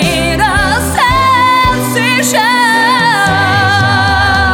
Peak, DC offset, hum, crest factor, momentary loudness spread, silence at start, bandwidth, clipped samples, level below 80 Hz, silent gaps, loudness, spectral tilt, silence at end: 0 dBFS; under 0.1%; none; 10 dB; 3 LU; 0 s; 18.5 kHz; under 0.1%; -26 dBFS; none; -9 LUFS; -3.5 dB/octave; 0 s